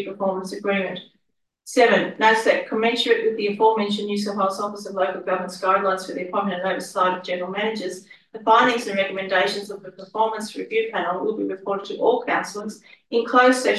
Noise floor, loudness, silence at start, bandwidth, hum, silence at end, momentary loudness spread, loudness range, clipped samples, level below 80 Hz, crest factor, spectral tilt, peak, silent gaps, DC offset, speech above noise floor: -74 dBFS; -22 LUFS; 0 s; 12.5 kHz; none; 0 s; 13 LU; 4 LU; under 0.1%; -74 dBFS; 18 dB; -4 dB/octave; -4 dBFS; none; under 0.1%; 52 dB